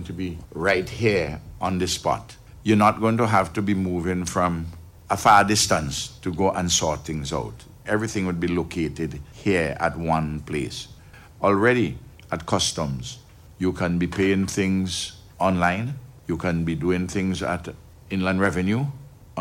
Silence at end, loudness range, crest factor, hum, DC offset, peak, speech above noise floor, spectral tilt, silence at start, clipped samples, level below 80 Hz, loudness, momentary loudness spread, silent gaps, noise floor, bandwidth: 0 s; 4 LU; 22 dB; none; under 0.1%; -2 dBFS; 23 dB; -4.5 dB/octave; 0 s; under 0.1%; -44 dBFS; -23 LUFS; 13 LU; none; -46 dBFS; 16.5 kHz